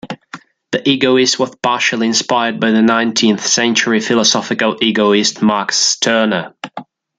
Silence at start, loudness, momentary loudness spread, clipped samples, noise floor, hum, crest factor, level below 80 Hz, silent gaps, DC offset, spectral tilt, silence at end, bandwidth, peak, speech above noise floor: 0.05 s; -13 LUFS; 9 LU; under 0.1%; -36 dBFS; none; 14 dB; -60 dBFS; none; under 0.1%; -2.5 dB/octave; 0.35 s; 9.4 kHz; 0 dBFS; 23 dB